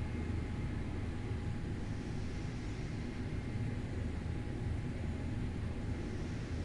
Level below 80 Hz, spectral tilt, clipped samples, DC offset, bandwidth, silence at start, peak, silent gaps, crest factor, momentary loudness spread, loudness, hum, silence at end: -46 dBFS; -7.5 dB/octave; under 0.1%; under 0.1%; 11.5 kHz; 0 s; -26 dBFS; none; 12 dB; 2 LU; -41 LUFS; none; 0 s